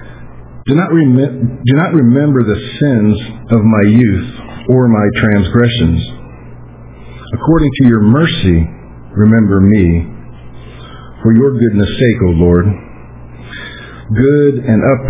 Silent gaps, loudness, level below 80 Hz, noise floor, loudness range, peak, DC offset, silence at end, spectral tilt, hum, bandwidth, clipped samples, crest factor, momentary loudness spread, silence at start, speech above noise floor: none; -11 LUFS; -26 dBFS; -32 dBFS; 2 LU; 0 dBFS; under 0.1%; 0 s; -12 dB/octave; none; 3.9 kHz; 0.2%; 10 dB; 15 LU; 0 s; 22 dB